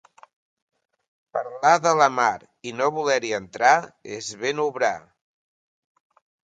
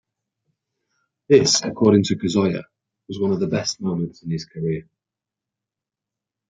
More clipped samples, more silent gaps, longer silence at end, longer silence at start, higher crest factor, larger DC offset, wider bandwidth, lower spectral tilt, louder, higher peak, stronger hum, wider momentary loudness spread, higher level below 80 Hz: neither; neither; second, 1.5 s vs 1.7 s; about the same, 1.35 s vs 1.3 s; about the same, 22 dB vs 20 dB; neither; about the same, 9.2 kHz vs 9.4 kHz; second, -3 dB/octave vs -5 dB/octave; about the same, -22 LUFS vs -20 LUFS; about the same, -4 dBFS vs -2 dBFS; neither; about the same, 15 LU vs 13 LU; second, -70 dBFS vs -60 dBFS